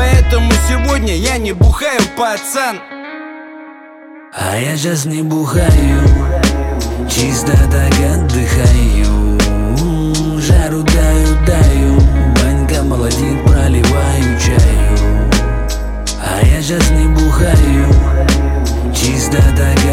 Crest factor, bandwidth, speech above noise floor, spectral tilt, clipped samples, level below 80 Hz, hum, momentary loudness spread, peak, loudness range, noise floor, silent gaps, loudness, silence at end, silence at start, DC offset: 10 dB; 16 kHz; 25 dB; -5.5 dB/octave; under 0.1%; -14 dBFS; none; 8 LU; 0 dBFS; 5 LU; -35 dBFS; none; -12 LUFS; 0 s; 0 s; under 0.1%